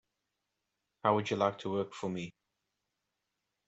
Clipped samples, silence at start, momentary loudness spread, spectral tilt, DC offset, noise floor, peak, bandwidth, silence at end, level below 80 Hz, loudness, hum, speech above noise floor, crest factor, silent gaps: under 0.1%; 1.05 s; 10 LU; -6 dB/octave; under 0.1%; -86 dBFS; -14 dBFS; 8.2 kHz; 1.35 s; -78 dBFS; -34 LUFS; none; 53 dB; 24 dB; none